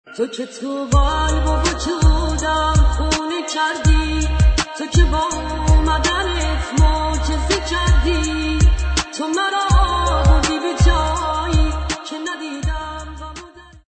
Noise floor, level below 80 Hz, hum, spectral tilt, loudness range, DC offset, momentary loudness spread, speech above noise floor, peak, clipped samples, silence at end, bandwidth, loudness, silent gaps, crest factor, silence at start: -39 dBFS; -20 dBFS; none; -4.5 dB/octave; 1 LU; under 0.1%; 9 LU; 23 dB; -2 dBFS; under 0.1%; 0.3 s; 9 kHz; -18 LUFS; none; 16 dB; 0.1 s